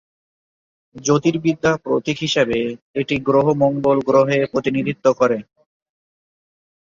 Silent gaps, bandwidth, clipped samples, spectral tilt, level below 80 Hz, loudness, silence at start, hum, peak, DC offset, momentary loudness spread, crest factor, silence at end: 2.82-2.94 s; 7.6 kHz; under 0.1%; -5.5 dB/octave; -54 dBFS; -18 LUFS; 0.95 s; none; -2 dBFS; under 0.1%; 7 LU; 16 dB; 1.45 s